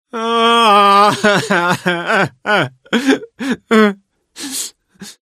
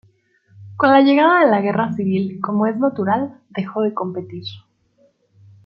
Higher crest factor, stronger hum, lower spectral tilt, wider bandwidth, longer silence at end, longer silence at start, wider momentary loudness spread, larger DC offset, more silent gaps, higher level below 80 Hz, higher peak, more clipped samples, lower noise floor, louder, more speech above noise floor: about the same, 14 dB vs 18 dB; neither; second, -4 dB/octave vs -9 dB/octave; first, 14.5 kHz vs 5.6 kHz; second, 0.25 s vs 1.05 s; second, 0.15 s vs 0.6 s; about the same, 14 LU vs 16 LU; neither; neither; about the same, -62 dBFS vs -66 dBFS; about the same, 0 dBFS vs 0 dBFS; neither; second, -38 dBFS vs -59 dBFS; first, -13 LUFS vs -17 LUFS; second, 23 dB vs 42 dB